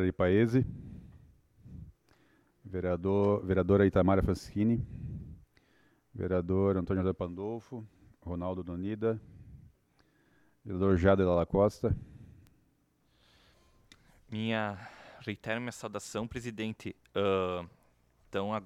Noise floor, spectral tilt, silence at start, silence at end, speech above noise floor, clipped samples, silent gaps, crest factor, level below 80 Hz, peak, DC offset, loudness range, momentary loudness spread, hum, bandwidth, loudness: -71 dBFS; -7.5 dB/octave; 0 s; 0 s; 41 dB; under 0.1%; none; 20 dB; -52 dBFS; -12 dBFS; under 0.1%; 9 LU; 21 LU; none; 12.5 kHz; -31 LUFS